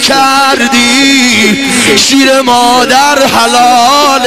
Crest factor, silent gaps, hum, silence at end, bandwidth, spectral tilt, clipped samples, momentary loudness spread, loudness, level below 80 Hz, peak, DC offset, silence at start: 6 dB; none; none; 0 s; 16.5 kHz; -2 dB/octave; 0.5%; 2 LU; -5 LUFS; -42 dBFS; 0 dBFS; 2%; 0 s